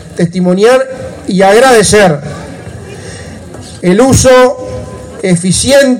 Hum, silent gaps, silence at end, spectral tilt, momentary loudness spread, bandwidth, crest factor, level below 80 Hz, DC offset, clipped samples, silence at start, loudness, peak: none; none; 0 s; -4.5 dB/octave; 21 LU; 16.5 kHz; 8 dB; -32 dBFS; under 0.1%; 0.8%; 0 s; -7 LUFS; 0 dBFS